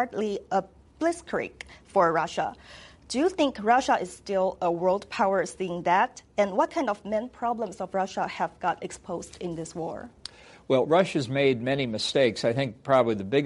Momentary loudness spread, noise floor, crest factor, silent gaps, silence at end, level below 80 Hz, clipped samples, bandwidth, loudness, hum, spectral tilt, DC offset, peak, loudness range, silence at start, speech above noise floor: 12 LU; -46 dBFS; 18 dB; none; 0 s; -60 dBFS; under 0.1%; 11.5 kHz; -27 LUFS; none; -5 dB/octave; under 0.1%; -8 dBFS; 5 LU; 0 s; 20 dB